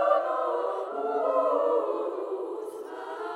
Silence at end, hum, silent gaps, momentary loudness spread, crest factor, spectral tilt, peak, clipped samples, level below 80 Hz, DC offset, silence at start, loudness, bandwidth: 0 s; none; none; 12 LU; 18 dB; -4 dB/octave; -10 dBFS; under 0.1%; -88 dBFS; under 0.1%; 0 s; -29 LUFS; 12.5 kHz